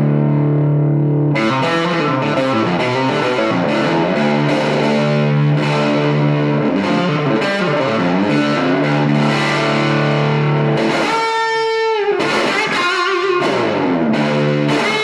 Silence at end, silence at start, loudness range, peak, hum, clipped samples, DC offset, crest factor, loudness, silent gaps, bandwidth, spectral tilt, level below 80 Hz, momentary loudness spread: 0 s; 0 s; 1 LU; -2 dBFS; none; under 0.1%; 0.1%; 12 dB; -15 LUFS; none; 11 kHz; -6.5 dB/octave; -58 dBFS; 1 LU